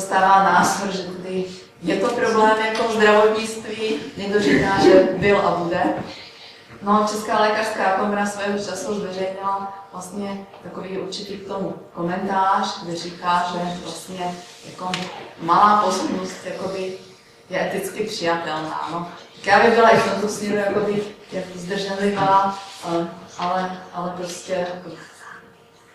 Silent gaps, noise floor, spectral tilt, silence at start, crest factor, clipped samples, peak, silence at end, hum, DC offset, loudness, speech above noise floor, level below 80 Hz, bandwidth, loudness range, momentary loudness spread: none; -50 dBFS; -4.5 dB/octave; 0 s; 18 dB; under 0.1%; -2 dBFS; 0.55 s; none; under 0.1%; -20 LUFS; 29 dB; -56 dBFS; 15 kHz; 8 LU; 17 LU